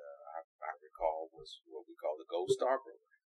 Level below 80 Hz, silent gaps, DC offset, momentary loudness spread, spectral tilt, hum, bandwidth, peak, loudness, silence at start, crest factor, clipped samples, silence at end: -70 dBFS; 0.44-0.59 s; under 0.1%; 18 LU; -4 dB/octave; none; 11.5 kHz; -20 dBFS; -39 LUFS; 0 s; 20 dB; under 0.1%; 0.35 s